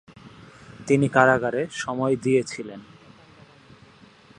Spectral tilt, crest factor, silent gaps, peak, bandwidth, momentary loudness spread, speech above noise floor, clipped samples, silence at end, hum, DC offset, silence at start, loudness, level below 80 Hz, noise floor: -6 dB/octave; 24 dB; none; -2 dBFS; 10.5 kHz; 20 LU; 30 dB; under 0.1%; 1.55 s; none; under 0.1%; 0.25 s; -22 LUFS; -60 dBFS; -51 dBFS